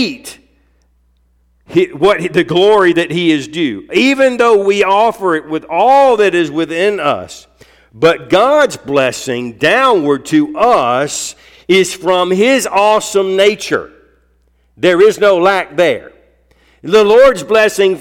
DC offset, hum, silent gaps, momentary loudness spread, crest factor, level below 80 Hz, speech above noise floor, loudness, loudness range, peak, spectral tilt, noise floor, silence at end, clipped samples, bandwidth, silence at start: under 0.1%; none; none; 9 LU; 12 dB; -48 dBFS; 43 dB; -11 LUFS; 2 LU; 0 dBFS; -4 dB/octave; -54 dBFS; 0 s; under 0.1%; 16.5 kHz; 0 s